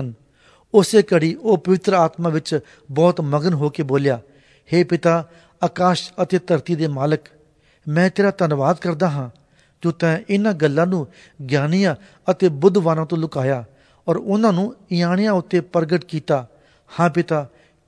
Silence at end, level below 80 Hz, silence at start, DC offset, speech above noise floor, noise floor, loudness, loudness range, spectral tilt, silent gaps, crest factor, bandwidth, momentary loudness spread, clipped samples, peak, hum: 0.4 s; -62 dBFS; 0 s; under 0.1%; 37 dB; -55 dBFS; -19 LUFS; 3 LU; -7 dB/octave; none; 18 dB; 11 kHz; 9 LU; under 0.1%; 0 dBFS; none